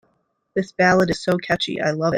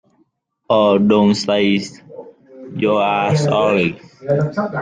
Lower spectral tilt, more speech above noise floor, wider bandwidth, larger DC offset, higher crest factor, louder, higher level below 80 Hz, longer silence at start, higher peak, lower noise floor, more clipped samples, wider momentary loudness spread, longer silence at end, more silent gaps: about the same, -5.5 dB/octave vs -6 dB/octave; about the same, 48 dB vs 47 dB; first, 14.5 kHz vs 9.4 kHz; neither; about the same, 18 dB vs 14 dB; second, -20 LUFS vs -16 LUFS; about the same, -52 dBFS vs -56 dBFS; second, 0.55 s vs 0.7 s; about the same, -2 dBFS vs -2 dBFS; first, -68 dBFS vs -62 dBFS; neither; about the same, 10 LU vs 12 LU; about the same, 0 s vs 0 s; neither